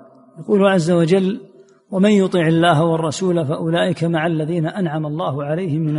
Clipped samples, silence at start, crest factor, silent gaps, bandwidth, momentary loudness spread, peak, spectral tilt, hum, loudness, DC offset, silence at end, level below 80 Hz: under 0.1%; 0.35 s; 14 dB; none; 11.5 kHz; 8 LU; -2 dBFS; -6.5 dB/octave; none; -17 LUFS; under 0.1%; 0 s; -60 dBFS